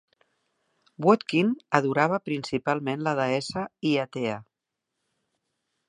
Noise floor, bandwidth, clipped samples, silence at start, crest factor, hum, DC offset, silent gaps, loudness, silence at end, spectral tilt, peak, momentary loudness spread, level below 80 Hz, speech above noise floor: -85 dBFS; 11 kHz; under 0.1%; 1 s; 24 dB; none; under 0.1%; none; -26 LUFS; 1.45 s; -6 dB/octave; -2 dBFS; 8 LU; -68 dBFS; 59 dB